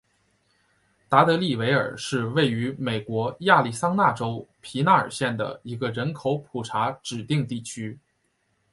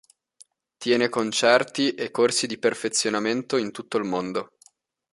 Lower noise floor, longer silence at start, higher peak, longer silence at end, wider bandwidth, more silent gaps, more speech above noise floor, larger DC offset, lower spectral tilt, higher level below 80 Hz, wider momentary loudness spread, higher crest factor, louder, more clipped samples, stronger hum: first, -71 dBFS vs -59 dBFS; first, 1.1 s vs 0.8 s; about the same, -2 dBFS vs -2 dBFS; about the same, 0.75 s vs 0.7 s; about the same, 11.5 kHz vs 11.5 kHz; neither; first, 47 dB vs 36 dB; neither; first, -5.5 dB/octave vs -3 dB/octave; first, -62 dBFS vs -70 dBFS; first, 12 LU vs 9 LU; about the same, 22 dB vs 22 dB; about the same, -24 LUFS vs -24 LUFS; neither; neither